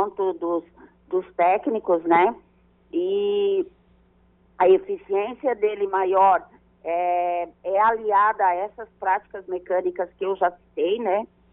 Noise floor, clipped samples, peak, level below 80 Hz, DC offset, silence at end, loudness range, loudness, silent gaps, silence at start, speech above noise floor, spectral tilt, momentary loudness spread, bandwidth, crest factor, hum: -59 dBFS; under 0.1%; -6 dBFS; -62 dBFS; under 0.1%; 0.25 s; 2 LU; -23 LUFS; none; 0 s; 37 dB; -3 dB/octave; 10 LU; 4 kHz; 16 dB; none